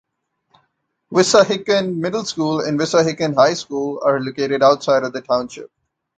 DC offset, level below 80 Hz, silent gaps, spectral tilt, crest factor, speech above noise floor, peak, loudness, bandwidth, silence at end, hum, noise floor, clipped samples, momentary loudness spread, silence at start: under 0.1%; -60 dBFS; none; -4.5 dB/octave; 18 dB; 53 dB; 0 dBFS; -17 LUFS; 9.4 kHz; 0.5 s; none; -70 dBFS; under 0.1%; 8 LU; 1.1 s